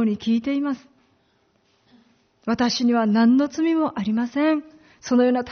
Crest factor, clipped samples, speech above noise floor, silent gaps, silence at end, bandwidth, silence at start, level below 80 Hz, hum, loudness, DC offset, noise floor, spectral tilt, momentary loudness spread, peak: 14 dB; under 0.1%; 44 dB; none; 0 s; 6.6 kHz; 0 s; -62 dBFS; none; -21 LUFS; under 0.1%; -64 dBFS; -4.5 dB/octave; 10 LU; -8 dBFS